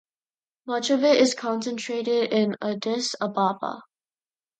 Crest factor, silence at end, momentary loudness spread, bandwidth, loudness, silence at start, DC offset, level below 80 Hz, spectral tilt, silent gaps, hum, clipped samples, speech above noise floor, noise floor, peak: 18 dB; 0.75 s; 12 LU; 9.4 kHz; -24 LUFS; 0.65 s; under 0.1%; -76 dBFS; -4 dB/octave; none; none; under 0.1%; over 66 dB; under -90 dBFS; -8 dBFS